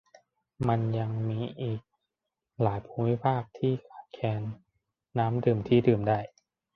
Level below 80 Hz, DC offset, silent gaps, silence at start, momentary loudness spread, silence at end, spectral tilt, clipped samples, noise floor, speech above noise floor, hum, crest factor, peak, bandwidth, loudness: -58 dBFS; under 0.1%; none; 0.6 s; 12 LU; 0.5 s; -10 dB/octave; under 0.1%; -87 dBFS; 59 dB; none; 20 dB; -8 dBFS; 6 kHz; -29 LUFS